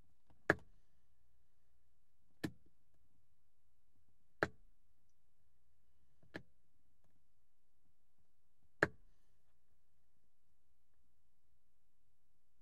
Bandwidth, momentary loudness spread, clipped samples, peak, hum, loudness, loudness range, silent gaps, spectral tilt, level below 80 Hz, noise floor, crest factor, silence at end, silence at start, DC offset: 6.4 kHz; 18 LU; under 0.1%; -12 dBFS; none; -42 LUFS; 18 LU; none; -4 dB/octave; -76 dBFS; -85 dBFS; 38 dB; 3.7 s; 0.5 s; 0.2%